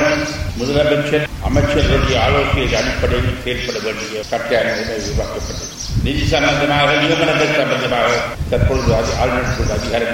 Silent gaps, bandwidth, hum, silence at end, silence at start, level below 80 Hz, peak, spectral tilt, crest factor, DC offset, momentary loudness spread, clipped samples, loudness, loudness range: none; 16.5 kHz; none; 0 s; 0 s; -26 dBFS; -2 dBFS; -5 dB/octave; 14 dB; under 0.1%; 8 LU; under 0.1%; -16 LUFS; 4 LU